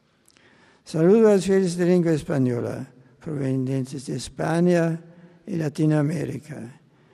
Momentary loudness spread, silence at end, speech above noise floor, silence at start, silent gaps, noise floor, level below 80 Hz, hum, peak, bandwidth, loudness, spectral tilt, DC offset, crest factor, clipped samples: 18 LU; 0.4 s; 37 dB; 0.85 s; none; -58 dBFS; -58 dBFS; none; -8 dBFS; 12.5 kHz; -22 LUFS; -7.5 dB/octave; under 0.1%; 16 dB; under 0.1%